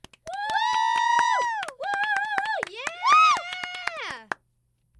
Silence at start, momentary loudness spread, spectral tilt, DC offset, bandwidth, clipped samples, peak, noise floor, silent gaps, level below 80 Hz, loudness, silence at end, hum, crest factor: 0.25 s; 16 LU; 0 dB/octave; under 0.1%; 12 kHz; under 0.1%; -6 dBFS; -70 dBFS; none; -68 dBFS; -24 LUFS; 0.65 s; none; 20 dB